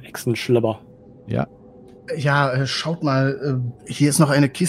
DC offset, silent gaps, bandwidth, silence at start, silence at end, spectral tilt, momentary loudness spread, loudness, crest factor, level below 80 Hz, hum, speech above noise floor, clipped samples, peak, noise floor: under 0.1%; none; 15 kHz; 0 s; 0 s; -5.5 dB/octave; 11 LU; -21 LUFS; 18 dB; -56 dBFS; none; 25 dB; under 0.1%; -4 dBFS; -45 dBFS